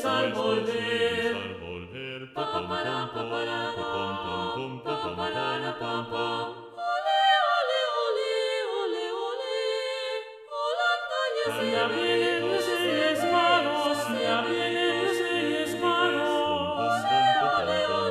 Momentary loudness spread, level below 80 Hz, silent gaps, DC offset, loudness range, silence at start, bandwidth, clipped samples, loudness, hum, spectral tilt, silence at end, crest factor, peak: 10 LU; -68 dBFS; none; under 0.1%; 6 LU; 0 s; 15 kHz; under 0.1%; -27 LUFS; none; -4 dB/octave; 0 s; 16 dB; -10 dBFS